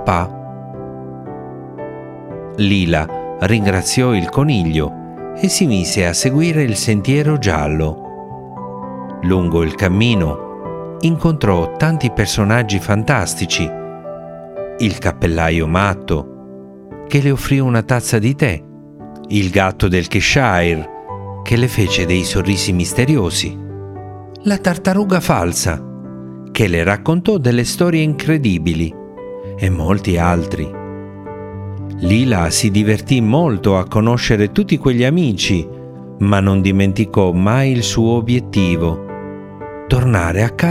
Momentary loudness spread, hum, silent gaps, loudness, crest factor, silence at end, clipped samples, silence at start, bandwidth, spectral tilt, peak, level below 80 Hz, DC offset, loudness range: 16 LU; none; none; -15 LUFS; 16 dB; 0 s; under 0.1%; 0 s; 16 kHz; -5.5 dB/octave; 0 dBFS; -36 dBFS; under 0.1%; 4 LU